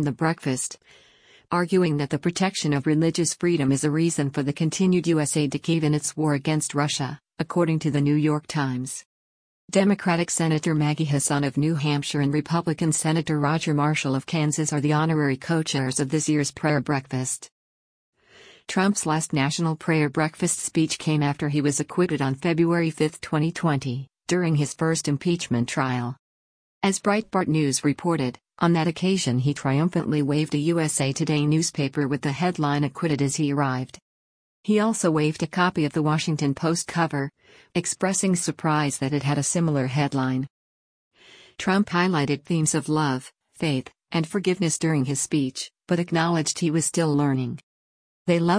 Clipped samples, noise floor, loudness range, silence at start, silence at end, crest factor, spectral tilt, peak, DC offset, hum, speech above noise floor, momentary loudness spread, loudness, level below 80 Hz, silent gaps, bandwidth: under 0.1%; -52 dBFS; 2 LU; 0 s; 0 s; 16 dB; -5 dB/octave; -6 dBFS; under 0.1%; none; 29 dB; 6 LU; -24 LUFS; -60 dBFS; 9.05-9.68 s, 17.51-18.13 s, 26.19-26.81 s, 34.02-34.63 s, 40.50-41.11 s, 47.63-48.25 s; 10.5 kHz